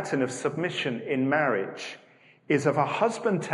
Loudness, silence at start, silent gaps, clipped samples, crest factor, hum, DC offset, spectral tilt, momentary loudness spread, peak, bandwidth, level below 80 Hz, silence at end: -27 LUFS; 0 s; none; under 0.1%; 18 dB; none; under 0.1%; -5.5 dB/octave; 11 LU; -10 dBFS; 11.5 kHz; -74 dBFS; 0 s